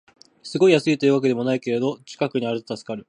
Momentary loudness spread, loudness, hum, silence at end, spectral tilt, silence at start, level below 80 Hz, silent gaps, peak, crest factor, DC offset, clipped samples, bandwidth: 13 LU; -21 LUFS; none; 0.1 s; -6 dB/octave; 0.45 s; -70 dBFS; none; -2 dBFS; 18 dB; under 0.1%; under 0.1%; 10.5 kHz